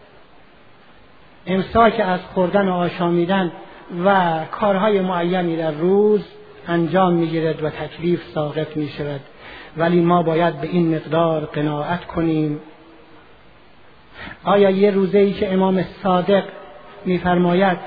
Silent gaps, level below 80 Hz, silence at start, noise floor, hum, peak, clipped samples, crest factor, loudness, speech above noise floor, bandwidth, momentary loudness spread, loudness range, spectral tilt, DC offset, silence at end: none; -50 dBFS; 1.45 s; -49 dBFS; none; 0 dBFS; under 0.1%; 18 dB; -19 LUFS; 31 dB; 5 kHz; 13 LU; 4 LU; -10.5 dB/octave; 0.4%; 0 s